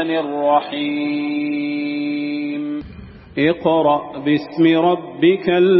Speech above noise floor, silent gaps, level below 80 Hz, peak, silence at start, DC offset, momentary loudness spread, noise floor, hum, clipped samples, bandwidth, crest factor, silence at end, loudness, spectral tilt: 21 dB; none; -52 dBFS; -4 dBFS; 0 s; under 0.1%; 8 LU; -37 dBFS; none; under 0.1%; 5.8 kHz; 14 dB; 0 s; -18 LUFS; -9.5 dB/octave